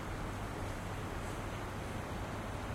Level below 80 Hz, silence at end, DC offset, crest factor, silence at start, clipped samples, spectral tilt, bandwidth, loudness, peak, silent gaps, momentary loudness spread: -48 dBFS; 0 s; under 0.1%; 14 dB; 0 s; under 0.1%; -5.5 dB/octave; 16.5 kHz; -42 LUFS; -28 dBFS; none; 0 LU